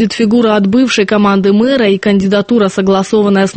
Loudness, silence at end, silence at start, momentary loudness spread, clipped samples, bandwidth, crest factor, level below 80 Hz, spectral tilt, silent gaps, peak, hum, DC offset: -10 LUFS; 0 s; 0 s; 2 LU; under 0.1%; 8.8 kHz; 10 dB; -46 dBFS; -6 dB/octave; none; 0 dBFS; none; under 0.1%